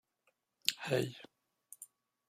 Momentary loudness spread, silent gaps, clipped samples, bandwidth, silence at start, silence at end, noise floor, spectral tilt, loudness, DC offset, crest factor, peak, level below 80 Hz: 20 LU; none; under 0.1%; 16 kHz; 0.65 s; 0.45 s; -80 dBFS; -3.5 dB/octave; -37 LUFS; under 0.1%; 34 dB; -8 dBFS; -78 dBFS